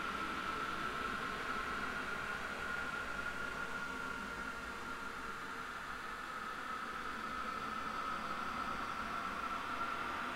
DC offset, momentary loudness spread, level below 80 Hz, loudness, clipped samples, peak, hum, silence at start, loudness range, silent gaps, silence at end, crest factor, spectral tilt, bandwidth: under 0.1%; 4 LU; -60 dBFS; -41 LUFS; under 0.1%; -28 dBFS; none; 0 s; 3 LU; none; 0 s; 14 dB; -3.5 dB/octave; 16 kHz